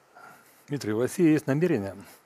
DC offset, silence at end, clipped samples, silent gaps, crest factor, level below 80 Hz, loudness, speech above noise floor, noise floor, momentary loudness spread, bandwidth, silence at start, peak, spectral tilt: under 0.1%; 0.2 s; under 0.1%; none; 16 dB; -72 dBFS; -26 LUFS; 26 dB; -52 dBFS; 13 LU; 15.5 kHz; 0.25 s; -10 dBFS; -7 dB/octave